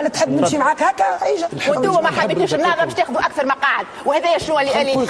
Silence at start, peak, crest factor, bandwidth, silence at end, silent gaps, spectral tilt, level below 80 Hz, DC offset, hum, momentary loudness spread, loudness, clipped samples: 0 s; -4 dBFS; 14 dB; 11 kHz; 0 s; none; -4 dB/octave; -54 dBFS; under 0.1%; none; 3 LU; -17 LUFS; under 0.1%